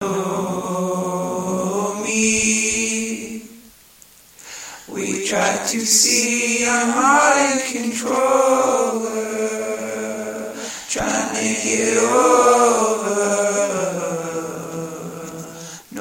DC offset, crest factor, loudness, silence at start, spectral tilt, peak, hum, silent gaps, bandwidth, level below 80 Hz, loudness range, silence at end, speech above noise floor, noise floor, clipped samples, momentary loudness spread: under 0.1%; 18 dB; -18 LUFS; 0 s; -2.5 dB/octave; 0 dBFS; none; none; 17 kHz; -54 dBFS; 6 LU; 0 s; 31 dB; -48 dBFS; under 0.1%; 17 LU